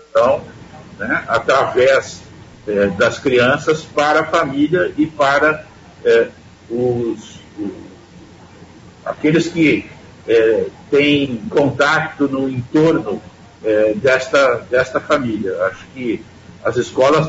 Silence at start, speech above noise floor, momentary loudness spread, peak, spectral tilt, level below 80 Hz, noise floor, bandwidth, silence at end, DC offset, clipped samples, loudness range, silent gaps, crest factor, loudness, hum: 0.15 s; 25 dB; 14 LU; -2 dBFS; -5.5 dB/octave; -50 dBFS; -41 dBFS; 8 kHz; 0 s; under 0.1%; under 0.1%; 5 LU; none; 14 dB; -16 LUFS; none